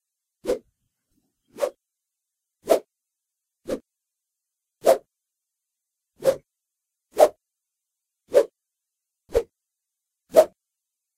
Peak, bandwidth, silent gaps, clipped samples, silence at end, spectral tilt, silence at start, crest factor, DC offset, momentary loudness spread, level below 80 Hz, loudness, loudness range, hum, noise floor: -2 dBFS; 16 kHz; none; under 0.1%; 0.7 s; -4 dB/octave; 0.45 s; 26 dB; under 0.1%; 16 LU; -54 dBFS; -24 LUFS; 6 LU; none; -84 dBFS